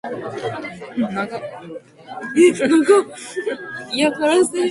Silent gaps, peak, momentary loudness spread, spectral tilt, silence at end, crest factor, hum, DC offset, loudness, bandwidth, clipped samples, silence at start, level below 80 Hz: none; -2 dBFS; 18 LU; -4 dB/octave; 0 s; 16 dB; none; under 0.1%; -19 LUFS; 11.5 kHz; under 0.1%; 0.05 s; -62 dBFS